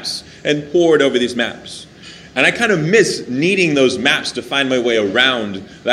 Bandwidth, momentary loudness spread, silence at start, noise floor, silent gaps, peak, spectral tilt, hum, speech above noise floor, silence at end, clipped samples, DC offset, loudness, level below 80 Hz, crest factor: 13.5 kHz; 11 LU; 0 s; -38 dBFS; none; 0 dBFS; -4 dB/octave; none; 23 dB; 0 s; under 0.1%; under 0.1%; -15 LUFS; -54 dBFS; 16 dB